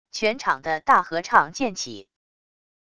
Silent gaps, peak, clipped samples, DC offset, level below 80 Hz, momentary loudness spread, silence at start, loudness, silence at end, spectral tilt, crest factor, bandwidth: none; -2 dBFS; under 0.1%; 0.4%; -60 dBFS; 13 LU; 0.15 s; -22 LUFS; 0.8 s; -3 dB/octave; 22 dB; 11 kHz